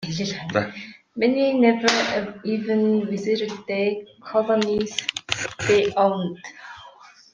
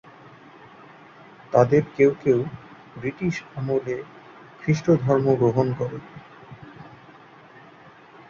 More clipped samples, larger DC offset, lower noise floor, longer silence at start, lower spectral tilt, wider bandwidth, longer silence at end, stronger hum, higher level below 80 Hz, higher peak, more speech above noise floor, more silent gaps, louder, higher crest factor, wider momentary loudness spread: neither; neither; about the same, -48 dBFS vs -48 dBFS; second, 0 s vs 1.5 s; second, -4.5 dB/octave vs -8 dB/octave; first, 10 kHz vs 7.2 kHz; second, 0.25 s vs 1.4 s; neither; about the same, -60 dBFS vs -58 dBFS; about the same, -2 dBFS vs -4 dBFS; about the same, 26 dB vs 27 dB; neither; about the same, -22 LUFS vs -23 LUFS; about the same, 22 dB vs 22 dB; second, 16 LU vs 25 LU